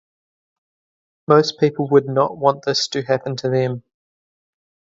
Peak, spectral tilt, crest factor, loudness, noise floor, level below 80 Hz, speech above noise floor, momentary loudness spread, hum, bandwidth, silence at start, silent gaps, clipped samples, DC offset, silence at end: 0 dBFS; -5.5 dB/octave; 20 dB; -18 LUFS; under -90 dBFS; -64 dBFS; over 72 dB; 7 LU; none; 7.8 kHz; 1.3 s; none; under 0.1%; under 0.1%; 1.1 s